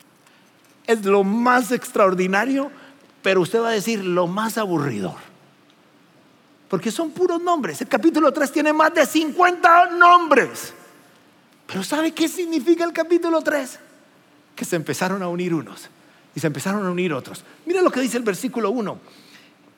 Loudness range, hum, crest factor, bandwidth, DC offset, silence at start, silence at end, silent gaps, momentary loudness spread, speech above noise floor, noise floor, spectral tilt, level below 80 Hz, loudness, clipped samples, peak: 9 LU; none; 20 dB; 17 kHz; under 0.1%; 0.9 s; 0.8 s; none; 14 LU; 35 dB; -54 dBFS; -5 dB/octave; -84 dBFS; -19 LUFS; under 0.1%; 0 dBFS